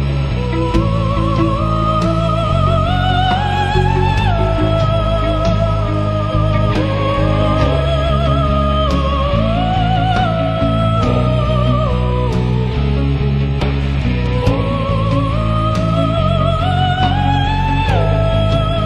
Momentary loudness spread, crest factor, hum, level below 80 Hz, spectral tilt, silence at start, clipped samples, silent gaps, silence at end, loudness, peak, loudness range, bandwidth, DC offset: 2 LU; 14 dB; none; -22 dBFS; -7.5 dB/octave; 0 s; under 0.1%; none; 0 s; -15 LUFS; 0 dBFS; 1 LU; 8.8 kHz; under 0.1%